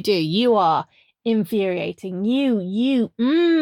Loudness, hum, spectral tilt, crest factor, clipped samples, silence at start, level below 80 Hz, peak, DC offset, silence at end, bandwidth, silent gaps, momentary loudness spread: -20 LUFS; none; -6.5 dB/octave; 14 dB; under 0.1%; 0 s; -68 dBFS; -6 dBFS; under 0.1%; 0 s; 17 kHz; none; 9 LU